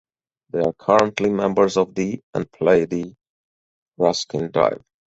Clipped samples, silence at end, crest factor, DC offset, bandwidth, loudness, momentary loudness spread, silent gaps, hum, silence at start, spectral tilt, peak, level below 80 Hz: under 0.1%; 0.3 s; 20 dB; under 0.1%; 8 kHz; -20 LUFS; 10 LU; 2.23-2.33 s, 3.29-3.86 s; none; 0.55 s; -5.5 dB/octave; -2 dBFS; -56 dBFS